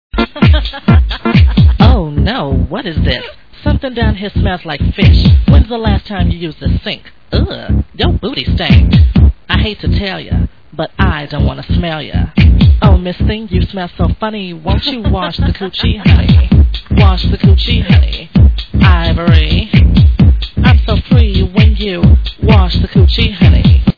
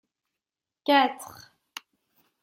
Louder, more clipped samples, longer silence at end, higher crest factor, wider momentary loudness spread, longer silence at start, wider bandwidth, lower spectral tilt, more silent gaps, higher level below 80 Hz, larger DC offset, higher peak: first, -11 LUFS vs -24 LUFS; first, 2% vs under 0.1%; second, 0.05 s vs 1.15 s; second, 10 dB vs 22 dB; second, 9 LU vs 22 LU; second, 0.15 s vs 0.85 s; second, 5.4 kHz vs 16.5 kHz; first, -9 dB/octave vs -2.5 dB/octave; neither; first, -14 dBFS vs -80 dBFS; first, 1% vs under 0.1%; first, 0 dBFS vs -8 dBFS